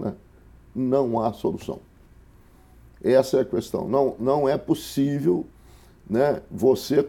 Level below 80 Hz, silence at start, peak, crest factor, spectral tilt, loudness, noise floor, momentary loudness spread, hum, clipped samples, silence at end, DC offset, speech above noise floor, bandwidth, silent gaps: -54 dBFS; 0 s; -6 dBFS; 18 dB; -7 dB/octave; -23 LUFS; -52 dBFS; 13 LU; none; under 0.1%; 0 s; under 0.1%; 29 dB; 17 kHz; none